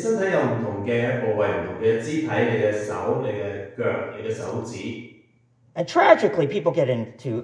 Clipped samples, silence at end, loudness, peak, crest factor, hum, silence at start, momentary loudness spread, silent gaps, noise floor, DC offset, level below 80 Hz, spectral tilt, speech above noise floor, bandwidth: under 0.1%; 0 s; -23 LUFS; -2 dBFS; 22 dB; none; 0 s; 12 LU; none; -60 dBFS; under 0.1%; -64 dBFS; -6.5 dB/octave; 37 dB; 10.5 kHz